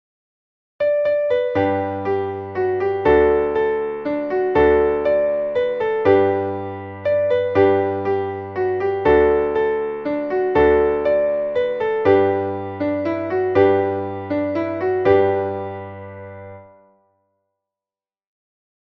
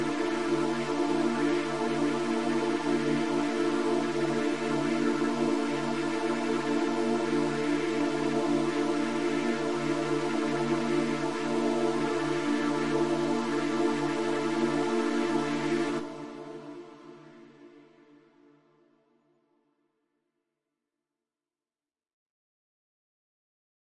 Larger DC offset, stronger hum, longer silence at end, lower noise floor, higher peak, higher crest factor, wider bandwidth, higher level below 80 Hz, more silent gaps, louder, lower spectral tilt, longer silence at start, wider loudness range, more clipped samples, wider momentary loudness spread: second, under 0.1% vs 0.5%; neither; first, 2.2 s vs 1.7 s; about the same, under -90 dBFS vs under -90 dBFS; first, -2 dBFS vs -16 dBFS; about the same, 16 dB vs 14 dB; second, 5.8 kHz vs 11.5 kHz; first, -44 dBFS vs -76 dBFS; second, none vs 22.13-22.30 s; first, -19 LUFS vs -29 LUFS; first, -8.5 dB/octave vs -5 dB/octave; first, 0.8 s vs 0 s; about the same, 4 LU vs 4 LU; neither; first, 10 LU vs 2 LU